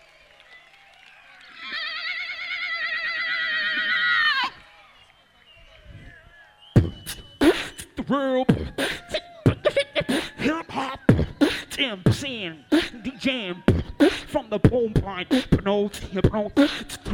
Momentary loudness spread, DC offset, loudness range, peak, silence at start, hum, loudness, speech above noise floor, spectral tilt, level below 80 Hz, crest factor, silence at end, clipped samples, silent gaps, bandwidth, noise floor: 9 LU; under 0.1%; 4 LU; -2 dBFS; 0.5 s; none; -24 LUFS; 32 dB; -5.5 dB/octave; -40 dBFS; 24 dB; 0 s; under 0.1%; none; 16.5 kHz; -55 dBFS